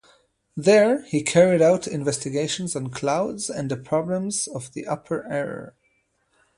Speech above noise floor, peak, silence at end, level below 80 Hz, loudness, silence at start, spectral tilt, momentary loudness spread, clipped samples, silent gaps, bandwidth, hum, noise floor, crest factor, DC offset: 46 dB; -4 dBFS; 0.9 s; -62 dBFS; -23 LUFS; 0.55 s; -4.5 dB/octave; 13 LU; under 0.1%; none; 11.5 kHz; none; -68 dBFS; 18 dB; under 0.1%